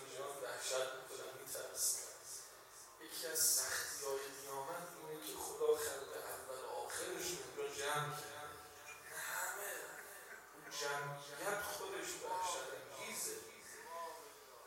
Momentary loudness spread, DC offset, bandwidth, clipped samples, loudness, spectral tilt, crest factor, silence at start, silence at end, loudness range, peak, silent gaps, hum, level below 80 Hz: 15 LU; under 0.1%; 16 kHz; under 0.1%; -42 LUFS; -1 dB/octave; 22 dB; 0 s; 0 s; 5 LU; -22 dBFS; none; none; -78 dBFS